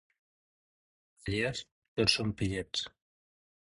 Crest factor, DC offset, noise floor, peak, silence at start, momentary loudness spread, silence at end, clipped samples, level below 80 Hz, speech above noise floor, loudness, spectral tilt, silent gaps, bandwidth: 26 dB; under 0.1%; under -90 dBFS; -10 dBFS; 1.25 s; 15 LU; 0.8 s; under 0.1%; -54 dBFS; over 58 dB; -32 LUFS; -4 dB/octave; 1.71-1.82 s, 1.88-1.96 s; 11.5 kHz